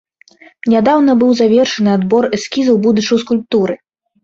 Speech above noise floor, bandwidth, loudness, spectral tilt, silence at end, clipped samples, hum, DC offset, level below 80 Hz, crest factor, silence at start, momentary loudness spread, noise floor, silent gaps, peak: 33 dB; 7.6 kHz; -13 LUFS; -5.5 dB/octave; 0.5 s; under 0.1%; none; under 0.1%; -54 dBFS; 12 dB; 0.65 s; 6 LU; -45 dBFS; none; -2 dBFS